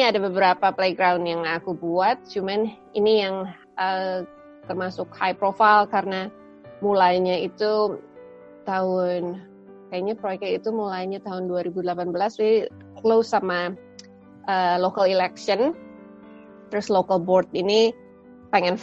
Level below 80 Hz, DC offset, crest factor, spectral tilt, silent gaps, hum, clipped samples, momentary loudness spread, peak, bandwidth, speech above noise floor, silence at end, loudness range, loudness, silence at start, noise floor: -66 dBFS; under 0.1%; 20 dB; -5.5 dB/octave; none; none; under 0.1%; 12 LU; -2 dBFS; 7.8 kHz; 25 dB; 0 s; 5 LU; -23 LUFS; 0 s; -47 dBFS